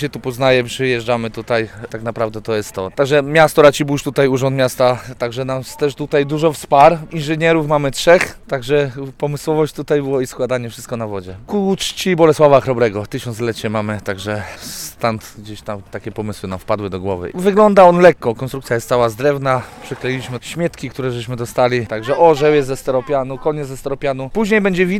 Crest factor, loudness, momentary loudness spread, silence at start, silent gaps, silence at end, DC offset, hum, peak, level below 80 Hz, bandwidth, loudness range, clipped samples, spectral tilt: 16 dB; -16 LUFS; 14 LU; 0 s; none; 0 s; under 0.1%; none; 0 dBFS; -44 dBFS; 17 kHz; 6 LU; 0.2%; -5.5 dB/octave